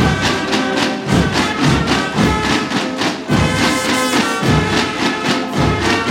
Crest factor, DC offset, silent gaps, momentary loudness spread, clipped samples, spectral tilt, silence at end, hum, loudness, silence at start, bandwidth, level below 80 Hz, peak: 14 dB; under 0.1%; none; 3 LU; under 0.1%; -4.5 dB/octave; 0 s; none; -15 LUFS; 0 s; 17 kHz; -32 dBFS; 0 dBFS